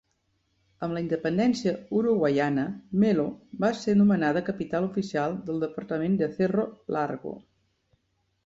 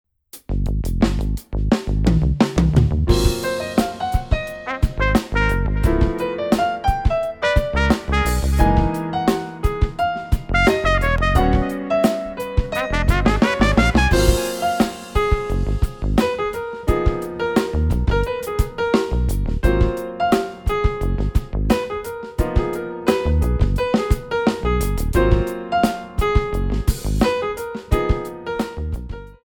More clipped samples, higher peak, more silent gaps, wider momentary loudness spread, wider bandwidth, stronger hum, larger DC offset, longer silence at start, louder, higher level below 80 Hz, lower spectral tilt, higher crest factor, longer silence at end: neither; second, -12 dBFS vs 0 dBFS; neither; about the same, 9 LU vs 7 LU; second, 7.8 kHz vs 19.5 kHz; neither; neither; first, 0.8 s vs 0.35 s; second, -27 LUFS vs -20 LUFS; second, -64 dBFS vs -22 dBFS; first, -7.5 dB/octave vs -6 dB/octave; about the same, 14 dB vs 18 dB; first, 1.05 s vs 0.1 s